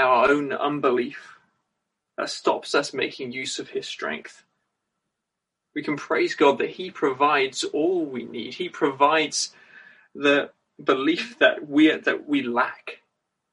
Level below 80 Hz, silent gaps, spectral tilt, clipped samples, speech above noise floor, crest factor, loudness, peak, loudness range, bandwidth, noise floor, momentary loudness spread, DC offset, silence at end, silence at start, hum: -70 dBFS; none; -3.5 dB/octave; under 0.1%; 60 dB; 20 dB; -23 LUFS; -4 dBFS; 6 LU; 11.5 kHz; -83 dBFS; 13 LU; under 0.1%; 0.6 s; 0 s; none